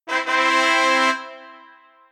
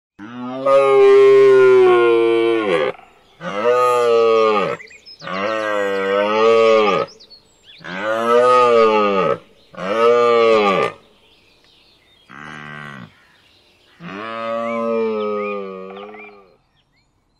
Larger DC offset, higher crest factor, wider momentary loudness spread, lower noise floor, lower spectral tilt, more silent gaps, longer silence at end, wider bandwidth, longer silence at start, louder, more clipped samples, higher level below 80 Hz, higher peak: neither; first, 18 dB vs 12 dB; second, 11 LU vs 22 LU; second, -50 dBFS vs -62 dBFS; second, 1 dB/octave vs -5.5 dB/octave; neither; second, 0.55 s vs 1.1 s; first, 14.5 kHz vs 12 kHz; second, 0.05 s vs 0.2 s; about the same, -17 LUFS vs -15 LUFS; neither; second, under -90 dBFS vs -62 dBFS; about the same, -2 dBFS vs -4 dBFS